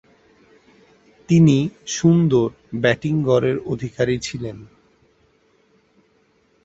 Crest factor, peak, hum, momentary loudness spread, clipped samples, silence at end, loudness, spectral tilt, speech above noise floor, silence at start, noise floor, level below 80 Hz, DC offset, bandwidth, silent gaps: 20 dB; -2 dBFS; none; 13 LU; under 0.1%; 2 s; -19 LUFS; -6.5 dB/octave; 42 dB; 1.3 s; -61 dBFS; -52 dBFS; under 0.1%; 8 kHz; none